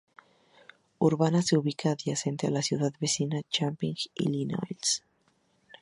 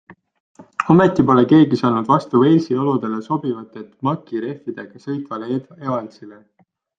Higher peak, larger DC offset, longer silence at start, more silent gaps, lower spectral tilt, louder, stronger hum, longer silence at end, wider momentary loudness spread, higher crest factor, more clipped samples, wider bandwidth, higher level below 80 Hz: second, -10 dBFS vs -2 dBFS; neither; first, 1 s vs 0.1 s; second, none vs 0.40-0.55 s; second, -4.5 dB/octave vs -8.5 dB/octave; second, -29 LUFS vs -18 LUFS; neither; first, 0.85 s vs 0.65 s; second, 7 LU vs 17 LU; about the same, 20 dB vs 16 dB; neither; first, 11.5 kHz vs 7.4 kHz; second, -70 dBFS vs -56 dBFS